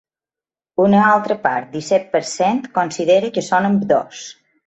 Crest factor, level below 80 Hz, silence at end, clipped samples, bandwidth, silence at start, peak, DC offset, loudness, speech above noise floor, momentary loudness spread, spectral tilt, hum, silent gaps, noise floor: 16 dB; -62 dBFS; 0.35 s; under 0.1%; 8.2 kHz; 0.8 s; -2 dBFS; under 0.1%; -17 LUFS; over 74 dB; 11 LU; -5.5 dB/octave; none; none; under -90 dBFS